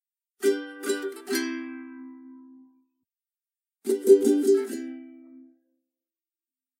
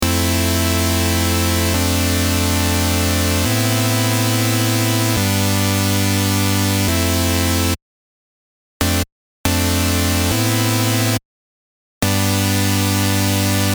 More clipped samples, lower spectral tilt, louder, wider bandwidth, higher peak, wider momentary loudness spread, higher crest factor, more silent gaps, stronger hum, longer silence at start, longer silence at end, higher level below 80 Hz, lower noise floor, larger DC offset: neither; about the same, -3 dB/octave vs -4 dB/octave; second, -25 LUFS vs -17 LUFS; second, 16 kHz vs over 20 kHz; second, -6 dBFS vs 0 dBFS; first, 23 LU vs 2 LU; first, 22 dB vs 16 dB; second, none vs 7.82-8.80 s, 9.12-9.44 s, 11.25-12.01 s; neither; first, 0.4 s vs 0 s; first, 1.65 s vs 0 s; second, -84 dBFS vs -34 dBFS; about the same, under -90 dBFS vs under -90 dBFS; neither